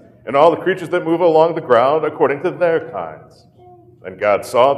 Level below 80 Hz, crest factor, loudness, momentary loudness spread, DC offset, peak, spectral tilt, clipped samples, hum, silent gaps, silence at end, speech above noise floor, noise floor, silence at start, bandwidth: -62 dBFS; 16 dB; -16 LUFS; 15 LU; under 0.1%; 0 dBFS; -6 dB/octave; under 0.1%; none; none; 0 s; 29 dB; -45 dBFS; 0.25 s; 13.5 kHz